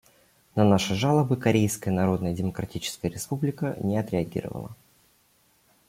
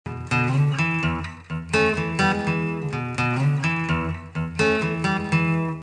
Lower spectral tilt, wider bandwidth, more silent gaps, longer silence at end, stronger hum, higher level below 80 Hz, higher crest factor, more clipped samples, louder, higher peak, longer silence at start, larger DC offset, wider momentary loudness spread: about the same, -6 dB/octave vs -6.5 dB/octave; first, 16.5 kHz vs 10 kHz; neither; first, 1.15 s vs 0 s; neither; second, -56 dBFS vs -44 dBFS; about the same, 20 dB vs 16 dB; neither; second, -26 LUFS vs -23 LUFS; about the same, -6 dBFS vs -6 dBFS; first, 0.55 s vs 0.05 s; neither; first, 11 LU vs 8 LU